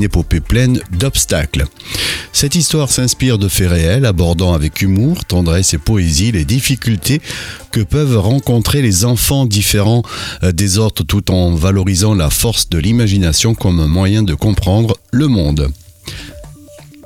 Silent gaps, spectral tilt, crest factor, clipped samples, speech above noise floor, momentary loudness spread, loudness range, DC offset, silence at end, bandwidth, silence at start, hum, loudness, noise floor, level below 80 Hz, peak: none; -4.5 dB/octave; 10 dB; under 0.1%; 25 dB; 6 LU; 1 LU; under 0.1%; 0.2 s; 17 kHz; 0 s; none; -13 LUFS; -37 dBFS; -24 dBFS; -2 dBFS